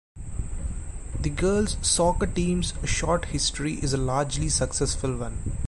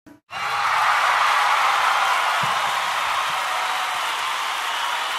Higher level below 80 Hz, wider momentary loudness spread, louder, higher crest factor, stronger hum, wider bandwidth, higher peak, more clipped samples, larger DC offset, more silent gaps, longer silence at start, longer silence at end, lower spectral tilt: first, -32 dBFS vs -66 dBFS; first, 13 LU vs 6 LU; second, -26 LUFS vs -20 LUFS; about the same, 16 dB vs 14 dB; neither; second, 11.5 kHz vs 16 kHz; second, -10 dBFS vs -6 dBFS; neither; neither; second, none vs 0.23-0.27 s; about the same, 0.15 s vs 0.05 s; about the same, 0 s vs 0 s; first, -4 dB/octave vs 0 dB/octave